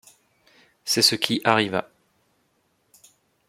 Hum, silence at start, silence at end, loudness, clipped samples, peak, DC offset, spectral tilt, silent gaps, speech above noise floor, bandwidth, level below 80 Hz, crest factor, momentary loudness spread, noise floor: none; 0.85 s; 1.7 s; -21 LUFS; under 0.1%; -2 dBFS; under 0.1%; -2.5 dB/octave; none; 47 dB; 16.5 kHz; -70 dBFS; 26 dB; 11 LU; -68 dBFS